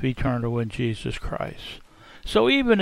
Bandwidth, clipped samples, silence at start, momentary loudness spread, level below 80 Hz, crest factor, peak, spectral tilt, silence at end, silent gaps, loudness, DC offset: 12.5 kHz; under 0.1%; 0 s; 19 LU; -40 dBFS; 18 dB; -6 dBFS; -6.5 dB/octave; 0 s; none; -25 LUFS; under 0.1%